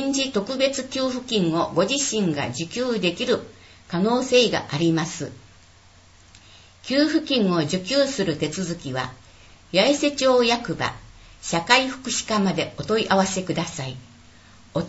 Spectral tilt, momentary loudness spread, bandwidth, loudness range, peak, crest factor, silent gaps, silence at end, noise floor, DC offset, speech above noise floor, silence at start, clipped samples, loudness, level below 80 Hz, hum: -4 dB/octave; 11 LU; 8.2 kHz; 3 LU; -2 dBFS; 22 dB; none; 0 s; -51 dBFS; under 0.1%; 29 dB; 0 s; under 0.1%; -22 LUFS; -54 dBFS; none